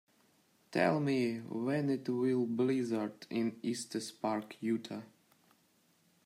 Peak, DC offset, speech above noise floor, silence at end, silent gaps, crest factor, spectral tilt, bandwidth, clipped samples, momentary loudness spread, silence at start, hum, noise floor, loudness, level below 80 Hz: -16 dBFS; under 0.1%; 37 dB; 1.2 s; none; 18 dB; -6 dB/octave; 15 kHz; under 0.1%; 7 LU; 0.7 s; none; -71 dBFS; -35 LUFS; -82 dBFS